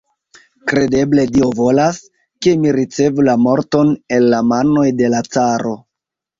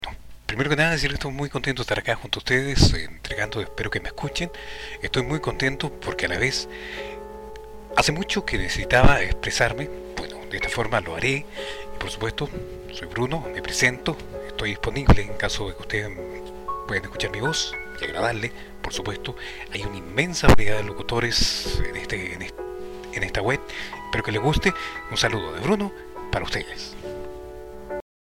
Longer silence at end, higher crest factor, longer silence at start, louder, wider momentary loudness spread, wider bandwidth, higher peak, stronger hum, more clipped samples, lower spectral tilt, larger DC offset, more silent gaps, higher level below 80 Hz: first, 0.65 s vs 0.35 s; second, 12 dB vs 18 dB; first, 0.65 s vs 0 s; first, -14 LUFS vs -25 LUFS; second, 5 LU vs 15 LU; second, 7.6 kHz vs 16 kHz; first, -2 dBFS vs -6 dBFS; neither; neither; first, -6 dB/octave vs -4 dB/octave; neither; neither; second, -48 dBFS vs -34 dBFS